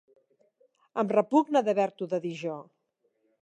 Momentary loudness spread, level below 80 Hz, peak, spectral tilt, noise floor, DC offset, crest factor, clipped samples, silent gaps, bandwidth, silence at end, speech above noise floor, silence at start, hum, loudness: 13 LU; -86 dBFS; -10 dBFS; -6.5 dB/octave; -75 dBFS; under 0.1%; 20 dB; under 0.1%; none; 9.4 kHz; 0.8 s; 48 dB; 0.95 s; none; -28 LUFS